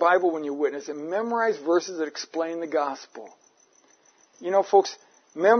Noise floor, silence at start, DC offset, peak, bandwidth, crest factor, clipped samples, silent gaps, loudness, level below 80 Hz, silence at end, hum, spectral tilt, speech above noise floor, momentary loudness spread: -60 dBFS; 0 s; under 0.1%; -6 dBFS; 6.6 kHz; 20 dB; under 0.1%; none; -26 LUFS; -88 dBFS; 0 s; none; -3.5 dB/octave; 35 dB; 17 LU